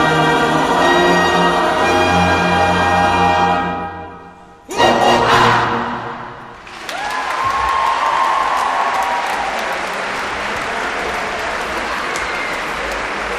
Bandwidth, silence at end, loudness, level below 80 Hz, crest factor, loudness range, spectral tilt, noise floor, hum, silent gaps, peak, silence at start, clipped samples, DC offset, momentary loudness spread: 15.5 kHz; 0 s; -15 LUFS; -40 dBFS; 16 dB; 7 LU; -4 dB/octave; -39 dBFS; none; none; -2 dBFS; 0 s; under 0.1%; under 0.1%; 12 LU